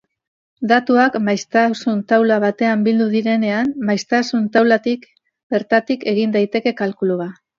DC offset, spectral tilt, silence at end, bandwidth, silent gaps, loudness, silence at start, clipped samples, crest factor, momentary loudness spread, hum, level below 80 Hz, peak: under 0.1%; -6 dB/octave; 0.25 s; 7.4 kHz; 5.43-5.50 s; -17 LUFS; 0.6 s; under 0.1%; 16 dB; 7 LU; none; -66 dBFS; 0 dBFS